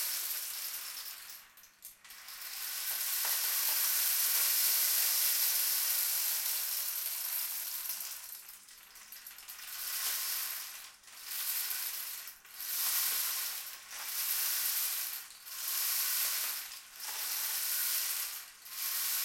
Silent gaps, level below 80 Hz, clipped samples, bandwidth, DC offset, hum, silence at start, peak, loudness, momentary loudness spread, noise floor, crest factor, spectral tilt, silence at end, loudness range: none; -80 dBFS; under 0.1%; 16.5 kHz; under 0.1%; none; 0 s; -16 dBFS; -32 LUFS; 19 LU; -56 dBFS; 18 dB; 4.5 dB/octave; 0 s; 10 LU